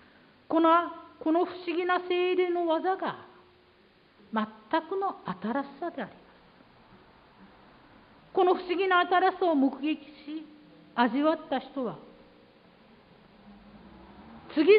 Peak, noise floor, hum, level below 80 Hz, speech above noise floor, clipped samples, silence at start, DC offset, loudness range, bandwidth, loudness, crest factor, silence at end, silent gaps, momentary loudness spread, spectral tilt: -10 dBFS; -61 dBFS; none; -70 dBFS; 33 dB; under 0.1%; 0.5 s; under 0.1%; 8 LU; 5.2 kHz; -28 LUFS; 20 dB; 0 s; none; 16 LU; -8.5 dB/octave